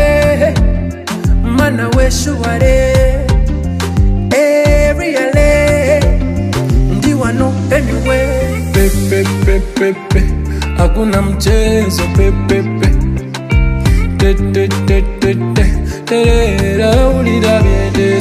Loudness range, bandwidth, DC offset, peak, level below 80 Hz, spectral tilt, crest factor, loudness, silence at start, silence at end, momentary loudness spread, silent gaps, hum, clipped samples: 2 LU; 15.5 kHz; under 0.1%; 0 dBFS; -16 dBFS; -6 dB/octave; 10 dB; -12 LUFS; 0 s; 0 s; 5 LU; none; none; under 0.1%